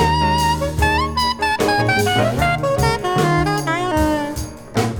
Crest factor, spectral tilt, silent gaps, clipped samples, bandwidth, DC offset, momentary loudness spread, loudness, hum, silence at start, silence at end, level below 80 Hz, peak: 16 dB; -5 dB/octave; none; under 0.1%; over 20 kHz; under 0.1%; 5 LU; -18 LUFS; none; 0 s; 0 s; -30 dBFS; -2 dBFS